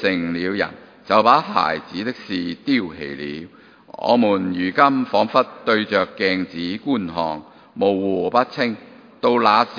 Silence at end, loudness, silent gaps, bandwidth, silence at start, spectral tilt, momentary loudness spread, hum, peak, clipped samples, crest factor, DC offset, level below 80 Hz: 0 s; -20 LUFS; none; 5.2 kHz; 0 s; -6.5 dB/octave; 12 LU; none; 0 dBFS; under 0.1%; 20 dB; under 0.1%; -60 dBFS